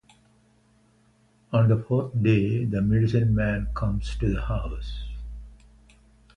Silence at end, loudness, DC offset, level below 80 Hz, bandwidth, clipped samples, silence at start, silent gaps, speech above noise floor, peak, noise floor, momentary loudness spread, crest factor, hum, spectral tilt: 0.8 s; -25 LUFS; under 0.1%; -36 dBFS; 7 kHz; under 0.1%; 1.5 s; none; 38 dB; -8 dBFS; -61 dBFS; 15 LU; 18 dB; none; -9 dB/octave